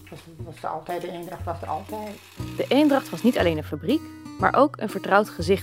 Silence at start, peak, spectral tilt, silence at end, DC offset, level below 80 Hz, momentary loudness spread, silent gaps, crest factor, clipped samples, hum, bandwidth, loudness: 0 s; -4 dBFS; -6 dB/octave; 0 s; under 0.1%; -50 dBFS; 17 LU; none; 22 dB; under 0.1%; none; 16 kHz; -24 LUFS